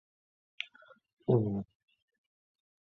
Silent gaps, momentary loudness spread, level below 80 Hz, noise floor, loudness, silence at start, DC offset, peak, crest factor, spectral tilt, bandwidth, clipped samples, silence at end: 1.13-1.17 s; 14 LU; -68 dBFS; -61 dBFS; -34 LUFS; 0.6 s; under 0.1%; -14 dBFS; 24 dB; -7 dB/octave; 6.4 kHz; under 0.1%; 1.25 s